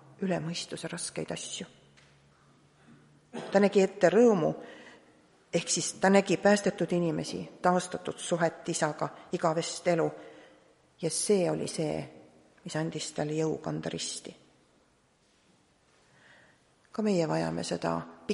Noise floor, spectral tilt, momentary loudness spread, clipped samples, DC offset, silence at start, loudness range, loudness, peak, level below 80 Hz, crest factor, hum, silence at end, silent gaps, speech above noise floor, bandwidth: -67 dBFS; -4.5 dB/octave; 14 LU; under 0.1%; under 0.1%; 0.2 s; 11 LU; -29 LUFS; -8 dBFS; -70 dBFS; 22 dB; none; 0 s; none; 38 dB; 11.5 kHz